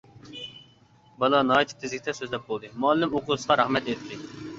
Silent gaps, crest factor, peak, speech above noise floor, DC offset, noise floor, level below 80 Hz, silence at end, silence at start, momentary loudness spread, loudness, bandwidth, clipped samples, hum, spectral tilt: none; 20 dB; -6 dBFS; 32 dB; under 0.1%; -57 dBFS; -62 dBFS; 0 s; 0.15 s; 17 LU; -25 LUFS; 8 kHz; under 0.1%; none; -4.5 dB/octave